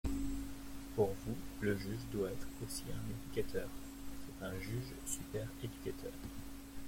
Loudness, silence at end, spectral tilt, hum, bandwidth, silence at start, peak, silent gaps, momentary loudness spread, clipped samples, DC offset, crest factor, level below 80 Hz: -43 LUFS; 0 s; -5.5 dB/octave; none; 16.5 kHz; 0.05 s; -22 dBFS; none; 12 LU; under 0.1%; under 0.1%; 20 dB; -52 dBFS